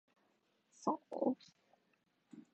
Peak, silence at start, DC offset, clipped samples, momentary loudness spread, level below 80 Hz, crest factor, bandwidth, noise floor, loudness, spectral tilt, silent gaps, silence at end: -22 dBFS; 0.8 s; under 0.1%; under 0.1%; 22 LU; under -90 dBFS; 22 dB; 8.4 kHz; -79 dBFS; -41 LUFS; -6.5 dB/octave; none; 0.15 s